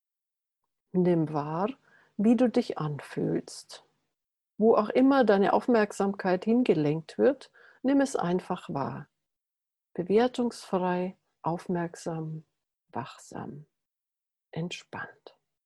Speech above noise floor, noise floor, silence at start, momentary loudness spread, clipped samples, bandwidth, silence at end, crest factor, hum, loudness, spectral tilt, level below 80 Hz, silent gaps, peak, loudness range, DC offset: 62 dB; -89 dBFS; 0.95 s; 18 LU; under 0.1%; 12 kHz; 0.55 s; 18 dB; none; -28 LUFS; -7 dB/octave; -70 dBFS; none; -10 dBFS; 12 LU; under 0.1%